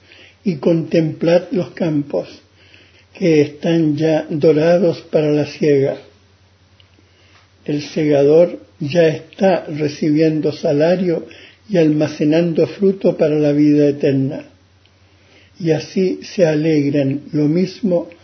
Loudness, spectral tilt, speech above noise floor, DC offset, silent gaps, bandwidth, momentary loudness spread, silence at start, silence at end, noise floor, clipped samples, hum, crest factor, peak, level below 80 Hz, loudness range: -16 LUFS; -7.5 dB/octave; 36 dB; under 0.1%; none; 6.6 kHz; 9 LU; 0.45 s; 0.15 s; -51 dBFS; under 0.1%; none; 14 dB; -2 dBFS; -58 dBFS; 4 LU